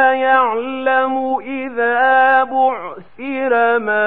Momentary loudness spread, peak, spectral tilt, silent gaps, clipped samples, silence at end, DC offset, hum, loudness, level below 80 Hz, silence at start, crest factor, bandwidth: 12 LU; -2 dBFS; -7 dB/octave; none; under 0.1%; 0 s; 0.8%; none; -15 LUFS; -62 dBFS; 0 s; 14 dB; 4.1 kHz